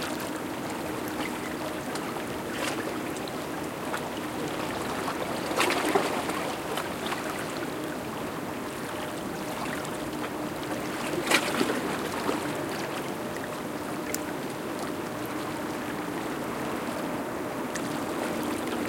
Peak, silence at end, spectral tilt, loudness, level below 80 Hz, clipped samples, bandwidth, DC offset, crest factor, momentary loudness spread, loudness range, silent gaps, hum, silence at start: -4 dBFS; 0 s; -4 dB/octave; -31 LUFS; -60 dBFS; under 0.1%; 17 kHz; under 0.1%; 26 dB; 7 LU; 4 LU; none; none; 0 s